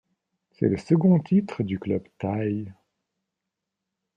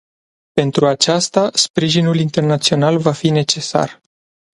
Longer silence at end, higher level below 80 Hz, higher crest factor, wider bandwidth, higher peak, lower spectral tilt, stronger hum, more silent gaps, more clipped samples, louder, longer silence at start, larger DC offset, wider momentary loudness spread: first, 1.45 s vs 0.65 s; second, -64 dBFS vs -54 dBFS; about the same, 18 dB vs 16 dB; second, 7.4 kHz vs 11.5 kHz; second, -8 dBFS vs 0 dBFS; first, -9.5 dB/octave vs -4.5 dB/octave; neither; second, none vs 1.70-1.74 s; neither; second, -25 LUFS vs -15 LUFS; about the same, 0.6 s vs 0.55 s; neither; first, 10 LU vs 5 LU